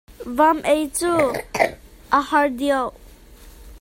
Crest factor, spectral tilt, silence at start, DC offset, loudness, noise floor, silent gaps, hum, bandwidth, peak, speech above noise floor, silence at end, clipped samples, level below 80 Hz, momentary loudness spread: 20 dB; -3.5 dB/octave; 0.1 s; under 0.1%; -20 LUFS; -44 dBFS; none; none; 16.5 kHz; -2 dBFS; 25 dB; 0.05 s; under 0.1%; -46 dBFS; 5 LU